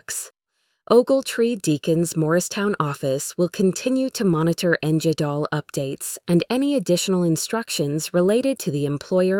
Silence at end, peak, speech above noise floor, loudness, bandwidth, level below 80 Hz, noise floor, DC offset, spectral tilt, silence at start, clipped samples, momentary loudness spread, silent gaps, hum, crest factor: 0 s; -4 dBFS; 51 dB; -21 LUFS; 18.5 kHz; -60 dBFS; -72 dBFS; under 0.1%; -5 dB/octave; 0.1 s; under 0.1%; 6 LU; none; none; 18 dB